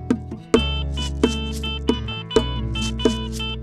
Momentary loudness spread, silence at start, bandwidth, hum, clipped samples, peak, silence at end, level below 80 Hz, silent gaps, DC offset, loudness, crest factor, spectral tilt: 6 LU; 0 s; 14.5 kHz; none; under 0.1%; -4 dBFS; 0 s; -30 dBFS; none; under 0.1%; -23 LUFS; 18 dB; -5.5 dB/octave